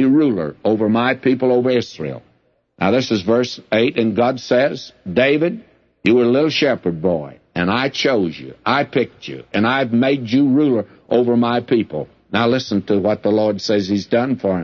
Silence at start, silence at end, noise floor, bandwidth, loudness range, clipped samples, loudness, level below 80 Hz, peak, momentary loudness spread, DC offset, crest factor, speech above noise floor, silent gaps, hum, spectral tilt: 0 s; 0 s; -60 dBFS; 7.2 kHz; 2 LU; under 0.1%; -17 LUFS; -56 dBFS; -2 dBFS; 9 LU; under 0.1%; 14 dB; 43 dB; none; none; -6.5 dB/octave